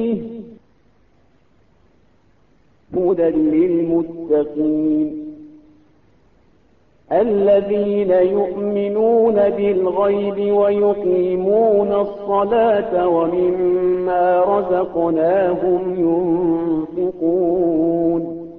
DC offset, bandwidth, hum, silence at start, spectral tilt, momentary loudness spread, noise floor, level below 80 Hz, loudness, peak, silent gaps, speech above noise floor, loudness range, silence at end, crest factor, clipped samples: 0.1%; 4.2 kHz; none; 0 s; -10.5 dB/octave; 6 LU; -57 dBFS; -52 dBFS; -17 LUFS; -4 dBFS; none; 41 dB; 5 LU; 0 s; 12 dB; under 0.1%